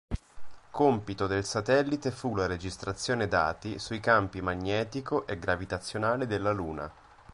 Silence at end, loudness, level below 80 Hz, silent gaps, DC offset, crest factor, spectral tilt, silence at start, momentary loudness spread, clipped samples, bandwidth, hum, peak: 0.4 s; -30 LUFS; -50 dBFS; none; under 0.1%; 22 dB; -5.5 dB/octave; 0.1 s; 10 LU; under 0.1%; 11.5 kHz; none; -8 dBFS